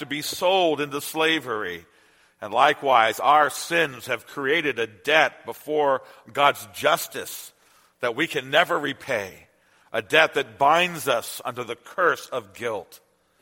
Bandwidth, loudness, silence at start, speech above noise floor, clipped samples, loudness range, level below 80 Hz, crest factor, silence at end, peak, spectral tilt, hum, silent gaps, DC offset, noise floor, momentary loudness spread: 16.5 kHz; -23 LUFS; 0 s; 36 dB; under 0.1%; 4 LU; -70 dBFS; 22 dB; 0.45 s; 0 dBFS; -3 dB/octave; none; none; under 0.1%; -59 dBFS; 14 LU